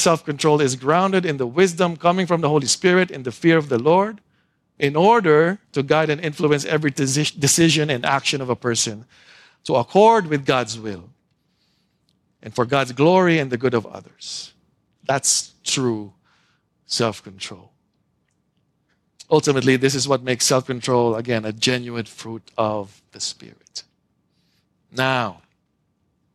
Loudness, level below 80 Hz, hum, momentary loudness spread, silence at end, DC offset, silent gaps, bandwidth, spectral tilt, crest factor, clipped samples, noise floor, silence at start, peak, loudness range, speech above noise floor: -19 LUFS; -62 dBFS; none; 17 LU; 1 s; under 0.1%; none; 14.5 kHz; -4 dB/octave; 18 dB; under 0.1%; -69 dBFS; 0 s; -2 dBFS; 8 LU; 49 dB